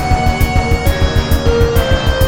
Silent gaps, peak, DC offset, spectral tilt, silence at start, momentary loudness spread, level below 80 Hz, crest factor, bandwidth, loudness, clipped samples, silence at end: none; 0 dBFS; 2%; -5.5 dB/octave; 0 s; 2 LU; -16 dBFS; 12 dB; 17.5 kHz; -14 LUFS; under 0.1%; 0 s